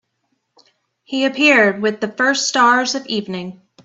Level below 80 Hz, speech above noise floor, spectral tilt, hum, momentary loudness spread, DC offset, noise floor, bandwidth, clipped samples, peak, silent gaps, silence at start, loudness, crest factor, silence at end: -66 dBFS; 54 dB; -3 dB/octave; none; 15 LU; under 0.1%; -70 dBFS; 8 kHz; under 0.1%; 0 dBFS; none; 1.1 s; -15 LUFS; 18 dB; 0.35 s